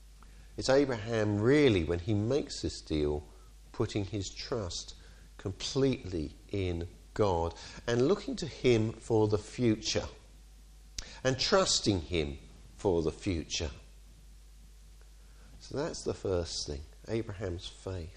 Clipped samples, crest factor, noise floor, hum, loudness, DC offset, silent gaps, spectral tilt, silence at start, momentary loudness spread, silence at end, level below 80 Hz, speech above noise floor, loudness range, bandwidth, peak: under 0.1%; 20 dB; -54 dBFS; none; -32 LUFS; under 0.1%; none; -5 dB/octave; 0 s; 14 LU; 0 s; -48 dBFS; 23 dB; 8 LU; 11.5 kHz; -14 dBFS